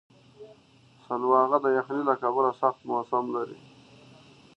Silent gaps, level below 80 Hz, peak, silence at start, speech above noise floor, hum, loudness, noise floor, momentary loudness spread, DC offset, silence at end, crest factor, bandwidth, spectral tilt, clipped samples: none; -78 dBFS; -8 dBFS; 0.4 s; 32 dB; none; -26 LUFS; -58 dBFS; 11 LU; under 0.1%; 1.05 s; 20 dB; 6.6 kHz; -7.5 dB/octave; under 0.1%